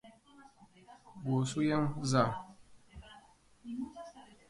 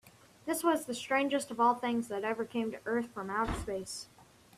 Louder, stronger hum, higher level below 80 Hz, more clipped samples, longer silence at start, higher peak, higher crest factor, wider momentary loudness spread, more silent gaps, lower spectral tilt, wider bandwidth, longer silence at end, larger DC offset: about the same, -34 LUFS vs -33 LUFS; neither; second, -64 dBFS vs -54 dBFS; neither; about the same, 0.05 s vs 0.05 s; about the same, -16 dBFS vs -16 dBFS; about the same, 22 dB vs 18 dB; first, 25 LU vs 10 LU; neither; first, -6 dB/octave vs -4 dB/octave; second, 11.5 kHz vs 15.5 kHz; about the same, 0.25 s vs 0.35 s; neither